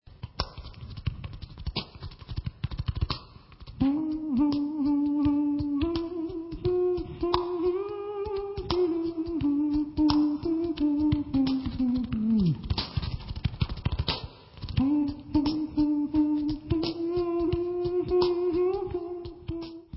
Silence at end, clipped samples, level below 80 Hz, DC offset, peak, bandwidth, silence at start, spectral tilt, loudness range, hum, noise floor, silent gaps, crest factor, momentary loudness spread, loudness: 0 s; under 0.1%; -42 dBFS; under 0.1%; -8 dBFS; 5.8 kHz; 0.05 s; -11 dB/octave; 4 LU; none; -48 dBFS; none; 20 dB; 12 LU; -29 LUFS